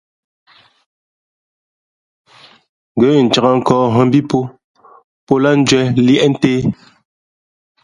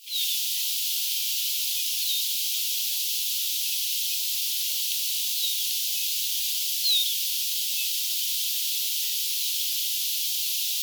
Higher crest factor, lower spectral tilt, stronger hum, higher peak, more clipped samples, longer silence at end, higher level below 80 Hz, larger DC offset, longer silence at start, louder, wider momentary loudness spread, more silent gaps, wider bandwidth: about the same, 16 dB vs 16 dB; first, -6 dB/octave vs 13 dB/octave; neither; first, 0 dBFS vs -12 dBFS; neither; first, 1.1 s vs 0 s; first, -50 dBFS vs under -90 dBFS; neither; first, 2.95 s vs 0 s; first, -13 LUFS vs -24 LUFS; first, 9 LU vs 1 LU; first, 4.64-4.75 s, 5.04-5.27 s vs none; second, 11 kHz vs over 20 kHz